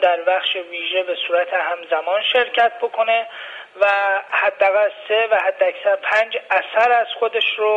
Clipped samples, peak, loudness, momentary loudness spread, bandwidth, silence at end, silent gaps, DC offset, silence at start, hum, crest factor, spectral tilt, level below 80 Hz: under 0.1%; -4 dBFS; -18 LUFS; 5 LU; 8 kHz; 0 s; none; under 0.1%; 0 s; none; 14 dB; -2 dB/octave; -70 dBFS